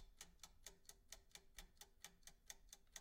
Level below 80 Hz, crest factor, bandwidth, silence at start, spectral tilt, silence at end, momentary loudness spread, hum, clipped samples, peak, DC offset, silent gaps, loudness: -70 dBFS; 28 dB; 16.5 kHz; 0 s; -0.5 dB/octave; 0 s; 4 LU; none; under 0.1%; -36 dBFS; under 0.1%; none; -62 LUFS